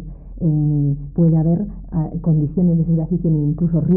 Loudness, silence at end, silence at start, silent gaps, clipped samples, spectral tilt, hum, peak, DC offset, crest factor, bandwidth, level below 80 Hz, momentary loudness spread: -18 LUFS; 0 s; 0 s; none; under 0.1%; -17 dB/octave; none; -6 dBFS; under 0.1%; 10 dB; 1.4 kHz; -34 dBFS; 7 LU